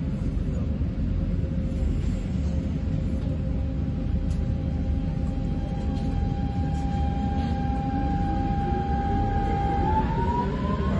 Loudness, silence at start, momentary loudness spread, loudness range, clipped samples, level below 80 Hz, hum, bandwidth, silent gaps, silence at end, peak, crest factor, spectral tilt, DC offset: -27 LUFS; 0 s; 3 LU; 2 LU; under 0.1%; -30 dBFS; none; 8 kHz; none; 0 s; -12 dBFS; 12 dB; -9 dB/octave; under 0.1%